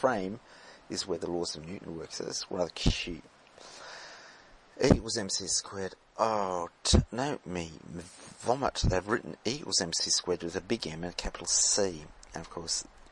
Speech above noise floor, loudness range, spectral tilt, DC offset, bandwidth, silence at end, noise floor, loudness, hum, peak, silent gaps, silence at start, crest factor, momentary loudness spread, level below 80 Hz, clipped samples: 24 dB; 5 LU; -3.5 dB/octave; under 0.1%; 11.5 kHz; 0.05 s; -55 dBFS; -31 LUFS; none; -6 dBFS; none; 0 s; 26 dB; 18 LU; -44 dBFS; under 0.1%